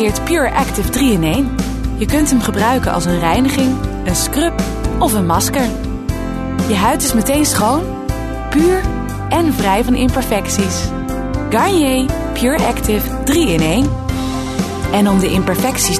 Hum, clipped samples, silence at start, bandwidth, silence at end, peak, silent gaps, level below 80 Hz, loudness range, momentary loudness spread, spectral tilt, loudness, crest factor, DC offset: none; under 0.1%; 0 s; 14 kHz; 0 s; -2 dBFS; none; -26 dBFS; 1 LU; 7 LU; -4.5 dB/octave; -15 LUFS; 12 dB; under 0.1%